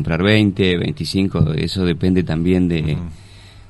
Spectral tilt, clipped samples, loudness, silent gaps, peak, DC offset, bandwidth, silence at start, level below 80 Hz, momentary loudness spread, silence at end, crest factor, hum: -7 dB/octave; under 0.1%; -17 LUFS; none; -2 dBFS; under 0.1%; 11.5 kHz; 0 s; -36 dBFS; 6 LU; 0.1 s; 16 dB; none